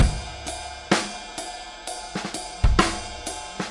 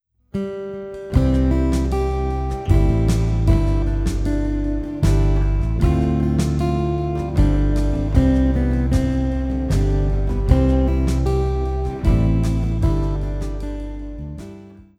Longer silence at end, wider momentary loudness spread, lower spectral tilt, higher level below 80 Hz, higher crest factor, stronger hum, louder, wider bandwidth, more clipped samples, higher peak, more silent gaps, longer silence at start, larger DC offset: second, 0 s vs 0.15 s; about the same, 12 LU vs 10 LU; second, -4 dB/octave vs -8 dB/octave; second, -30 dBFS vs -22 dBFS; first, 22 dB vs 16 dB; neither; second, -27 LUFS vs -20 LUFS; about the same, 11.5 kHz vs 11.5 kHz; neither; about the same, -4 dBFS vs -2 dBFS; neither; second, 0 s vs 0.35 s; neither